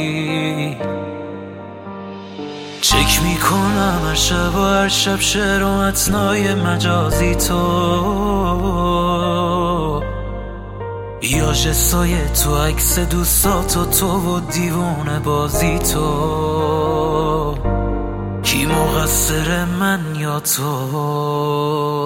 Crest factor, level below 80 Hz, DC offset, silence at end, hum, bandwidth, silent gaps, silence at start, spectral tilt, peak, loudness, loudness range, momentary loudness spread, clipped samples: 16 dB; -26 dBFS; under 0.1%; 0 s; none; 17 kHz; none; 0 s; -4 dB/octave; -2 dBFS; -17 LUFS; 3 LU; 13 LU; under 0.1%